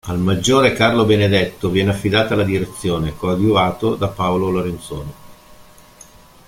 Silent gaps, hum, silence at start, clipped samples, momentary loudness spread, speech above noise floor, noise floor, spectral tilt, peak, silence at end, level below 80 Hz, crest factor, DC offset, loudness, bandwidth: none; none; 0.05 s; under 0.1%; 8 LU; 28 dB; -44 dBFS; -5.5 dB/octave; -2 dBFS; 0.85 s; -42 dBFS; 16 dB; under 0.1%; -17 LUFS; 16.5 kHz